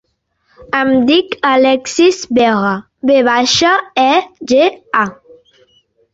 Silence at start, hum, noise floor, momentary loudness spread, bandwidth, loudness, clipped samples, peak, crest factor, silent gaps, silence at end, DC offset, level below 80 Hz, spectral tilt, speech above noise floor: 0.6 s; none; -62 dBFS; 6 LU; 8 kHz; -12 LUFS; under 0.1%; -2 dBFS; 12 dB; none; 1 s; under 0.1%; -52 dBFS; -3.5 dB/octave; 50 dB